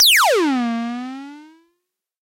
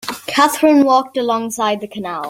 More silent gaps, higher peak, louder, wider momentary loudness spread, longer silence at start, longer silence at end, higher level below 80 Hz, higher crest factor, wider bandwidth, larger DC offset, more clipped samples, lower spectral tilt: neither; second, -4 dBFS vs 0 dBFS; about the same, -16 LUFS vs -15 LUFS; first, 22 LU vs 9 LU; about the same, 0 s vs 0.05 s; first, 0.8 s vs 0 s; second, -74 dBFS vs -62 dBFS; about the same, 14 dB vs 14 dB; about the same, 16 kHz vs 16.5 kHz; neither; neither; second, -0.5 dB/octave vs -3.5 dB/octave